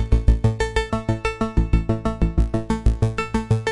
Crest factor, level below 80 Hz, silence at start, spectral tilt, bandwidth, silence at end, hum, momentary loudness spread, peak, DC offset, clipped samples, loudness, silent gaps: 18 dB; -22 dBFS; 0 s; -7 dB/octave; 11 kHz; 0 s; none; 4 LU; -2 dBFS; under 0.1%; under 0.1%; -22 LUFS; none